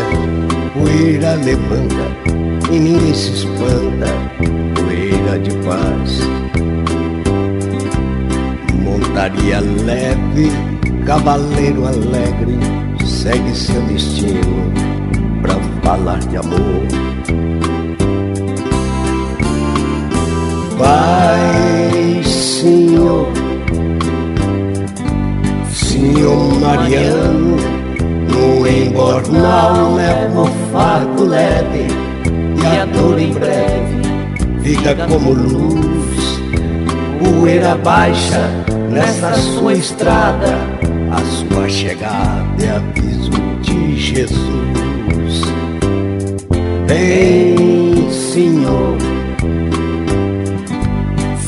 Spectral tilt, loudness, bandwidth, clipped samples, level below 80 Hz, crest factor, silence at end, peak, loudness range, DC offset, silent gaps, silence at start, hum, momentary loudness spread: -6 dB/octave; -14 LUFS; 11.5 kHz; under 0.1%; -24 dBFS; 12 dB; 0 s; 0 dBFS; 4 LU; under 0.1%; none; 0 s; none; 7 LU